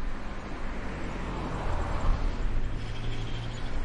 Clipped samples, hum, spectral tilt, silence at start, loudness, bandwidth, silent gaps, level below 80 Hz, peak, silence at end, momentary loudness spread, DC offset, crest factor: under 0.1%; none; -6 dB/octave; 0 s; -35 LUFS; 8.8 kHz; none; -32 dBFS; -14 dBFS; 0 s; 7 LU; under 0.1%; 16 dB